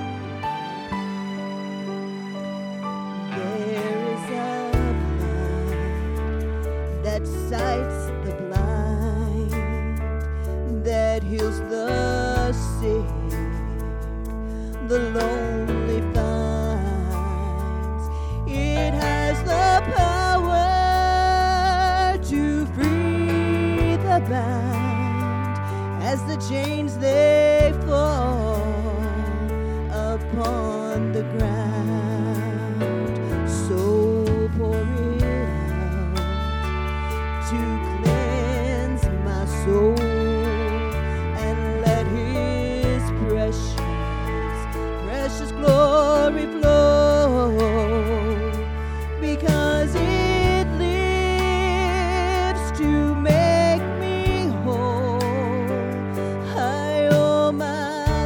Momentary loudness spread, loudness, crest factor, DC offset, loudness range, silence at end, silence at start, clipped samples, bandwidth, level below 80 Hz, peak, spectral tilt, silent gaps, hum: 9 LU; -22 LUFS; 18 dB; under 0.1%; 6 LU; 0 s; 0 s; under 0.1%; 18 kHz; -28 dBFS; -4 dBFS; -6.5 dB/octave; none; none